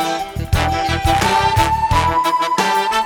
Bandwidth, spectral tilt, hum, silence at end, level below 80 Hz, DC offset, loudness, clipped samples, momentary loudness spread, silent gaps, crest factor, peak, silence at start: over 20 kHz; -4 dB/octave; none; 0 s; -28 dBFS; under 0.1%; -16 LUFS; under 0.1%; 5 LU; none; 14 dB; -2 dBFS; 0 s